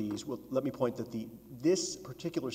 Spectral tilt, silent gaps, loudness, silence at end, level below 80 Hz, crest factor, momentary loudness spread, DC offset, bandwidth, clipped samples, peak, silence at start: -5 dB/octave; none; -35 LUFS; 0 s; -68 dBFS; 18 dB; 10 LU; under 0.1%; 16 kHz; under 0.1%; -16 dBFS; 0 s